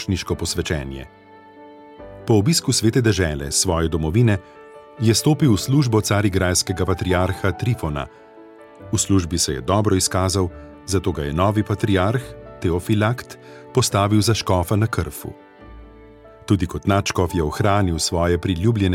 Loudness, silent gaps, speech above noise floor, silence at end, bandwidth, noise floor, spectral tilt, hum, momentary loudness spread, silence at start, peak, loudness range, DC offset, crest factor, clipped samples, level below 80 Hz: -20 LUFS; none; 25 dB; 0 s; 16.5 kHz; -44 dBFS; -5 dB/octave; none; 10 LU; 0 s; -2 dBFS; 3 LU; under 0.1%; 18 dB; under 0.1%; -38 dBFS